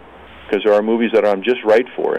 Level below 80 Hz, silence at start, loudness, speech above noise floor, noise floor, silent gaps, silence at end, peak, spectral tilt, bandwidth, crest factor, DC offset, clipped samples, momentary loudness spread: -54 dBFS; 0.2 s; -16 LUFS; 24 dB; -39 dBFS; none; 0 s; -4 dBFS; -6 dB/octave; 9 kHz; 12 dB; under 0.1%; under 0.1%; 4 LU